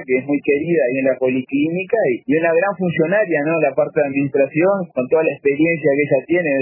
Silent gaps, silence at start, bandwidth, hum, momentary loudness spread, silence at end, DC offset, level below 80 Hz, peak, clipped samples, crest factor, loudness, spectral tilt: none; 0 s; 3.1 kHz; none; 3 LU; 0 s; under 0.1%; -64 dBFS; -4 dBFS; under 0.1%; 14 dB; -17 LUFS; -11.5 dB/octave